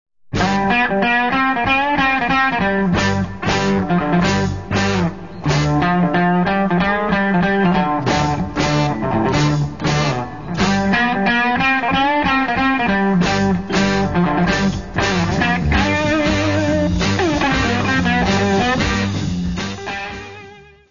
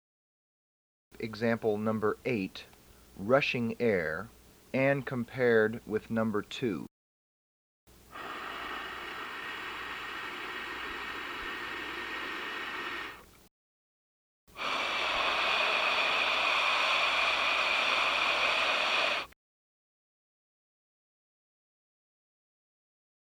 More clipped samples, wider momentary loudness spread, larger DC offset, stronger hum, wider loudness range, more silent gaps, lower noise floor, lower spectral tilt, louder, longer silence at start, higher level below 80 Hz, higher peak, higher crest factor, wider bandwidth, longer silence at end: neither; second, 5 LU vs 13 LU; first, 1% vs under 0.1%; neither; second, 2 LU vs 12 LU; second, none vs 6.91-7.87 s, 13.51-14.47 s; second, -41 dBFS vs under -90 dBFS; first, -5.5 dB/octave vs -4 dB/octave; first, -17 LUFS vs -30 LUFS; second, 0.05 s vs 1.2 s; first, -34 dBFS vs -64 dBFS; first, -2 dBFS vs -12 dBFS; second, 14 dB vs 22 dB; second, 7.4 kHz vs over 20 kHz; second, 0 s vs 4.05 s